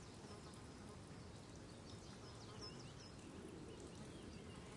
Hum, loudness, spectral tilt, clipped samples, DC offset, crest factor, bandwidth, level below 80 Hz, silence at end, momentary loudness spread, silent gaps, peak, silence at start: none; -56 LUFS; -5 dB/octave; under 0.1%; under 0.1%; 14 dB; 11.5 kHz; -68 dBFS; 0 s; 3 LU; none; -42 dBFS; 0 s